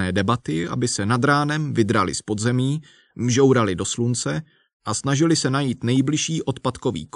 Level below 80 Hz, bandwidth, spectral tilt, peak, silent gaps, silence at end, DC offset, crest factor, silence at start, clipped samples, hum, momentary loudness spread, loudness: -54 dBFS; 11 kHz; -5 dB/octave; -4 dBFS; 4.73-4.80 s; 0.1 s; under 0.1%; 16 dB; 0 s; under 0.1%; none; 8 LU; -21 LUFS